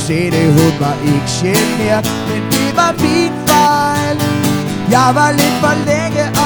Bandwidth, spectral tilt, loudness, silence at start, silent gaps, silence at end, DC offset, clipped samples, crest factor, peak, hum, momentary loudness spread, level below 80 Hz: over 20 kHz; -5 dB/octave; -13 LUFS; 0 s; none; 0 s; under 0.1%; under 0.1%; 12 dB; 0 dBFS; none; 5 LU; -42 dBFS